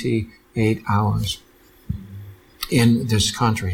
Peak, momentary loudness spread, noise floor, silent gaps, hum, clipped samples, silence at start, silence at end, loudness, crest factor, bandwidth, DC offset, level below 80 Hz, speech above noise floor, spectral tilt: -6 dBFS; 16 LU; -39 dBFS; none; none; under 0.1%; 0 s; 0 s; -21 LUFS; 16 dB; 18 kHz; under 0.1%; -42 dBFS; 20 dB; -5 dB/octave